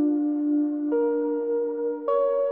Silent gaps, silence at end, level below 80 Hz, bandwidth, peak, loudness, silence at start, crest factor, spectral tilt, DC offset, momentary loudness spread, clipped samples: none; 0 s; -82 dBFS; 3.6 kHz; -14 dBFS; -25 LUFS; 0 s; 10 dB; -10 dB/octave; under 0.1%; 3 LU; under 0.1%